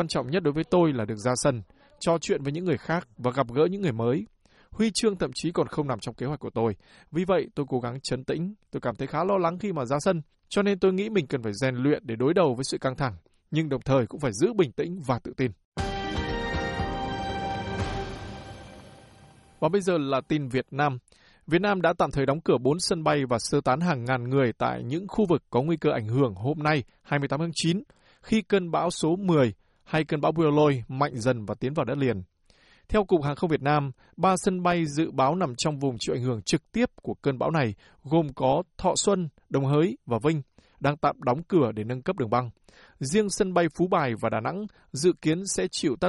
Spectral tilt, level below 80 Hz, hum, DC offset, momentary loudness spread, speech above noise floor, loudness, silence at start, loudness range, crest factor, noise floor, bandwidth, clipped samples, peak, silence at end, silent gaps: -5.5 dB/octave; -50 dBFS; none; under 0.1%; 7 LU; 34 dB; -27 LUFS; 0 s; 4 LU; 16 dB; -60 dBFS; 11.5 kHz; under 0.1%; -10 dBFS; 0 s; 15.65-15.72 s